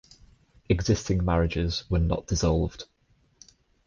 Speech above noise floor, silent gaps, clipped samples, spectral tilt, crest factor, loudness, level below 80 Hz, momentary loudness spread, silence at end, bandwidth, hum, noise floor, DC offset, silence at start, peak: 33 dB; none; under 0.1%; -6 dB/octave; 16 dB; -26 LUFS; -36 dBFS; 7 LU; 1.05 s; 7.4 kHz; none; -58 dBFS; under 0.1%; 0.7 s; -10 dBFS